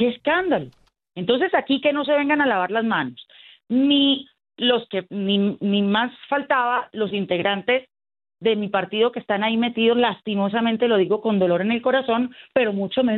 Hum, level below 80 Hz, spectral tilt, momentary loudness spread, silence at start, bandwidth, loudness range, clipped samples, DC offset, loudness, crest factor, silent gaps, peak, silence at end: none; -66 dBFS; -9 dB/octave; 6 LU; 0 s; 4.3 kHz; 2 LU; under 0.1%; under 0.1%; -21 LUFS; 16 dB; none; -4 dBFS; 0 s